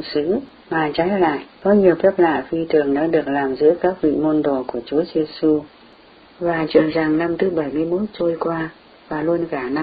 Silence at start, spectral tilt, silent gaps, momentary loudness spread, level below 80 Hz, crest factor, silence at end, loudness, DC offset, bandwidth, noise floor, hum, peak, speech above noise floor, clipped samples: 0 s; -11 dB/octave; none; 7 LU; -52 dBFS; 18 dB; 0 s; -19 LUFS; under 0.1%; 5 kHz; -47 dBFS; none; -2 dBFS; 29 dB; under 0.1%